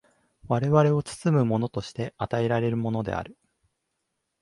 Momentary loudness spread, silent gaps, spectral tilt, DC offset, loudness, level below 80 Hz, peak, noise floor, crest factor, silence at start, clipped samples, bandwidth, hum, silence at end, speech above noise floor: 11 LU; none; -7.5 dB/octave; under 0.1%; -26 LUFS; -54 dBFS; -6 dBFS; -79 dBFS; 20 dB; 0.45 s; under 0.1%; 11.5 kHz; none; 1.1 s; 55 dB